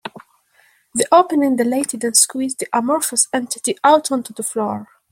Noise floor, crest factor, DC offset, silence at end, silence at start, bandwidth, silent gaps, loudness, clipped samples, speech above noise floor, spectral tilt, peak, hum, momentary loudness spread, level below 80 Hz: -57 dBFS; 18 dB; under 0.1%; 0.25 s; 0.05 s; 16.5 kHz; none; -17 LUFS; under 0.1%; 39 dB; -2 dB/octave; 0 dBFS; none; 10 LU; -66 dBFS